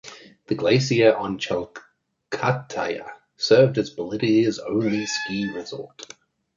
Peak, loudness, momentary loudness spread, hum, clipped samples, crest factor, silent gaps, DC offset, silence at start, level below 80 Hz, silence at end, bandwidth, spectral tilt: -4 dBFS; -22 LUFS; 20 LU; none; under 0.1%; 18 dB; none; under 0.1%; 0.05 s; -60 dBFS; 0.55 s; 7.6 kHz; -5.5 dB/octave